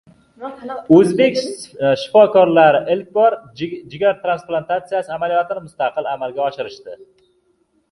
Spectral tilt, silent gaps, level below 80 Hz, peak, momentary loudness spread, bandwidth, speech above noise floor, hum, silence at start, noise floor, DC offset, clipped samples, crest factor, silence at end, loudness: -6 dB/octave; none; -60 dBFS; 0 dBFS; 18 LU; 11.5 kHz; 46 dB; none; 0.4 s; -62 dBFS; under 0.1%; under 0.1%; 16 dB; 0.95 s; -16 LUFS